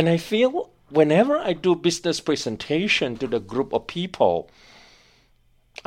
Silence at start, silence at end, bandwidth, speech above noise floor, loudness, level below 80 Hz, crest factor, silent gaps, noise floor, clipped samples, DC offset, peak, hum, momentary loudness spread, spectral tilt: 0 s; 1.45 s; 15.5 kHz; 38 dB; -22 LUFS; -56 dBFS; 20 dB; none; -60 dBFS; under 0.1%; under 0.1%; -4 dBFS; none; 8 LU; -5 dB/octave